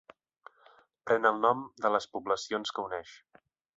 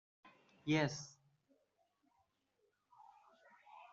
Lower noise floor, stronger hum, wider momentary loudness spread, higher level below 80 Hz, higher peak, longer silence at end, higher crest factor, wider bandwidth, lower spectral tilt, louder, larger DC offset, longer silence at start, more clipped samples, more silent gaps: second, -62 dBFS vs -82 dBFS; second, none vs 50 Hz at -100 dBFS; second, 14 LU vs 24 LU; first, -74 dBFS vs -80 dBFS; first, -10 dBFS vs -22 dBFS; first, 0.6 s vs 0.05 s; about the same, 22 dB vs 24 dB; about the same, 8 kHz vs 7.6 kHz; second, -3.5 dB/octave vs -5 dB/octave; first, -30 LUFS vs -39 LUFS; neither; first, 1.05 s vs 0.25 s; neither; neither